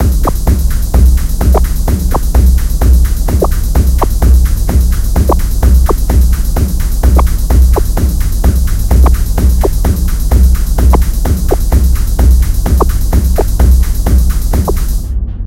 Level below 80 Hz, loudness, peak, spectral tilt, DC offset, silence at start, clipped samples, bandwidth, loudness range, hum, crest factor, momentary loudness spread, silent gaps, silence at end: -8 dBFS; -12 LUFS; 0 dBFS; -6.5 dB/octave; under 0.1%; 0 s; 0.7%; 16.5 kHz; 0 LU; none; 8 dB; 4 LU; none; 0 s